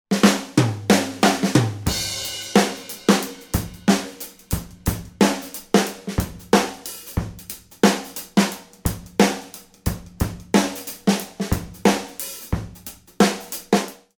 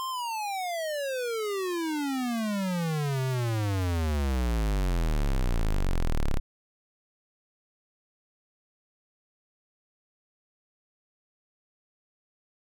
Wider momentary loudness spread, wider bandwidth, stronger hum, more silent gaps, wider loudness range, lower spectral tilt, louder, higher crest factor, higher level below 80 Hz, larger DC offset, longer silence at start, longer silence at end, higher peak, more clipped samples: first, 11 LU vs 3 LU; about the same, over 20 kHz vs 19.5 kHz; neither; neither; second, 3 LU vs 9 LU; about the same, -4.5 dB/octave vs -5.5 dB/octave; first, -22 LUFS vs -30 LUFS; first, 22 dB vs 8 dB; about the same, -38 dBFS vs -34 dBFS; neither; about the same, 0.1 s vs 0 s; second, 0.25 s vs 6.4 s; first, 0 dBFS vs -22 dBFS; neither